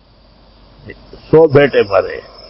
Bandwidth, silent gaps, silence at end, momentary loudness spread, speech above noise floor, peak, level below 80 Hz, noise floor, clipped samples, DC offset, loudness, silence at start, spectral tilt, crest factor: 5.8 kHz; none; 0.3 s; 8 LU; 34 dB; 0 dBFS; -44 dBFS; -46 dBFS; under 0.1%; under 0.1%; -11 LUFS; 0.85 s; -10 dB/octave; 14 dB